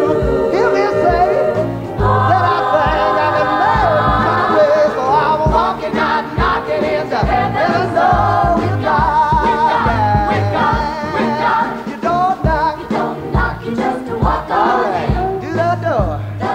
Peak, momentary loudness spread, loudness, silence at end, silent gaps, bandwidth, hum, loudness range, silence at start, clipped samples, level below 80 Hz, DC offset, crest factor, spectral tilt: -2 dBFS; 6 LU; -15 LUFS; 0 s; none; 15.5 kHz; none; 4 LU; 0 s; under 0.1%; -28 dBFS; under 0.1%; 12 dB; -7 dB/octave